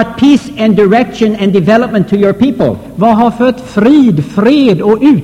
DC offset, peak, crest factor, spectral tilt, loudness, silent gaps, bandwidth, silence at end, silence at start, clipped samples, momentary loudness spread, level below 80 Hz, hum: 0.2%; 0 dBFS; 8 dB; -7.5 dB/octave; -9 LUFS; none; 11.5 kHz; 0 s; 0 s; 0.6%; 4 LU; -40 dBFS; none